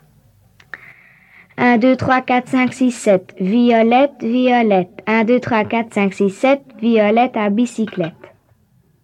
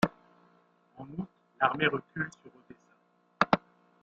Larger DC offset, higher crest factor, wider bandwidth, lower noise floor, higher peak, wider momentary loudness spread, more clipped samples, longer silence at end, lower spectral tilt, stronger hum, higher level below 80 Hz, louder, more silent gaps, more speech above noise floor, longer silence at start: neither; second, 16 dB vs 30 dB; first, 11 kHz vs 7.6 kHz; second, -56 dBFS vs -68 dBFS; about the same, -2 dBFS vs -4 dBFS; second, 9 LU vs 16 LU; neither; first, 0.95 s vs 0.45 s; first, -6 dB/octave vs -3.5 dB/octave; neither; about the same, -62 dBFS vs -66 dBFS; first, -16 LUFS vs -31 LUFS; neither; first, 41 dB vs 36 dB; first, 0.75 s vs 0 s